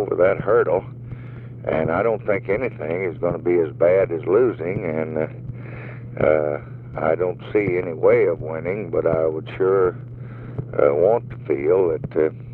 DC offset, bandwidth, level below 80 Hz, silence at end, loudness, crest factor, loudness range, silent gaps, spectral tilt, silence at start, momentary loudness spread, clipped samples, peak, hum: under 0.1%; 4.2 kHz; -48 dBFS; 0 s; -21 LUFS; 16 dB; 2 LU; none; -11 dB/octave; 0 s; 16 LU; under 0.1%; -4 dBFS; none